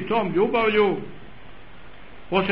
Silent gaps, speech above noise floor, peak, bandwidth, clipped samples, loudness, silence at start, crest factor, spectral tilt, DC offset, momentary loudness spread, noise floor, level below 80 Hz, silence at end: none; 25 dB; -6 dBFS; 5.4 kHz; under 0.1%; -22 LUFS; 0 s; 18 dB; -9 dB/octave; 1%; 11 LU; -46 dBFS; -50 dBFS; 0 s